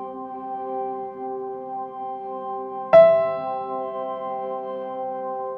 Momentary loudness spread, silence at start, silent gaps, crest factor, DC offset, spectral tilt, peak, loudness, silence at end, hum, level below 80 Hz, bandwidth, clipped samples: 17 LU; 0 s; none; 20 dB; under 0.1%; -8 dB/octave; -4 dBFS; -23 LUFS; 0 s; none; -64 dBFS; 5 kHz; under 0.1%